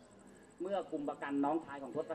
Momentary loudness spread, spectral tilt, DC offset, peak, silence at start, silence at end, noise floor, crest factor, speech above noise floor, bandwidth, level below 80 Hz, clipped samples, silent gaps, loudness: 23 LU; -6.5 dB/octave; under 0.1%; -24 dBFS; 0 s; 0 s; -59 dBFS; 16 dB; 21 dB; 8.8 kHz; -76 dBFS; under 0.1%; none; -39 LUFS